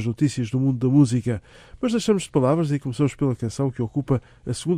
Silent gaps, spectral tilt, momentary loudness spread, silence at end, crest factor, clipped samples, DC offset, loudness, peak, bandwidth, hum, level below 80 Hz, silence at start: none; -7 dB/octave; 10 LU; 0 s; 16 dB; under 0.1%; under 0.1%; -23 LUFS; -6 dBFS; 11.5 kHz; none; -50 dBFS; 0 s